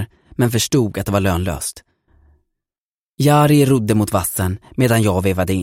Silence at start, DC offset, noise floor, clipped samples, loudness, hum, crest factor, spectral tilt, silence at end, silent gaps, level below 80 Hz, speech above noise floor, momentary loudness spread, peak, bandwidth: 0 s; under 0.1%; under -90 dBFS; under 0.1%; -17 LUFS; none; 14 dB; -5.5 dB/octave; 0 s; 2.78-3.18 s; -42 dBFS; over 74 dB; 10 LU; -2 dBFS; 16.5 kHz